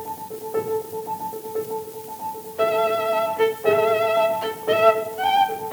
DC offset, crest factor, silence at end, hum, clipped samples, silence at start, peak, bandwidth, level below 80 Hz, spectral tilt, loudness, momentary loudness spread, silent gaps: under 0.1%; 20 dB; 0 s; none; under 0.1%; 0 s; -2 dBFS; over 20 kHz; -70 dBFS; -3.5 dB/octave; -22 LUFS; 13 LU; none